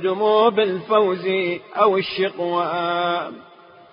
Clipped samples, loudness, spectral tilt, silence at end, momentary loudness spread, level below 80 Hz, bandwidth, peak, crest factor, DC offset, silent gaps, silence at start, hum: under 0.1%; -20 LUFS; -10 dB/octave; 0.5 s; 7 LU; -68 dBFS; 5.4 kHz; -2 dBFS; 18 dB; under 0.1%; none; 0 s; none